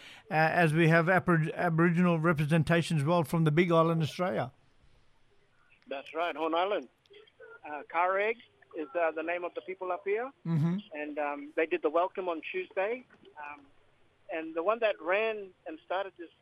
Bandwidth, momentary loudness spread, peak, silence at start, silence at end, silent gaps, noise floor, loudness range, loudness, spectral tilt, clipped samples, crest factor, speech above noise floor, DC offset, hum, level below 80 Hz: 13 kHz; 16 LU; -12 dBFS; 0 s; 0.15 s; none; -64 dBFS; 8 LU; -30 LUFS; -7 dB/octave; under 0.1%; 18 dB; 35 dB; under 0.1%; none; -66 dBFS